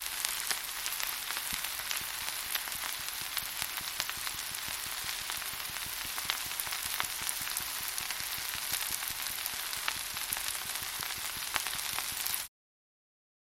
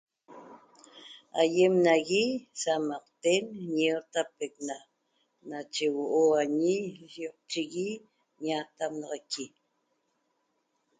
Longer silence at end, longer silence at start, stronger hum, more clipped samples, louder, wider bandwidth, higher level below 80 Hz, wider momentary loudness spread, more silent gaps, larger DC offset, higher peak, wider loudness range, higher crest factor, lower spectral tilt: second, 1 s vs 1.5 s; second, 0 s vs 0.3 s; neither; neither; second, -34 LUFS vs -29 LUFS; first, 17 kHz vs 9.6 kHz; first, -62 dBFS vs -78 dBFS; second, 3 LU vs 17 LU; neither; neither; first, -4 dBFS vs -12 dBFS; second, 1 LU vs 9 LU; first, 32 dB vs 20 dB; second, 1 dB/octave vs -4 dB/octave